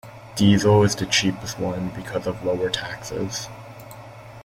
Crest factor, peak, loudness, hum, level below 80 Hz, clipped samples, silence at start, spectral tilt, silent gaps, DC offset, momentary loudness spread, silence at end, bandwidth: 18 dB; -4 dBFS; -22 LUFS; none; -50 dBFS; under 0.1%; 0.05 s; -5 dB/octave; none; under 0.1%; 23 LU; 0 s; 16 kHz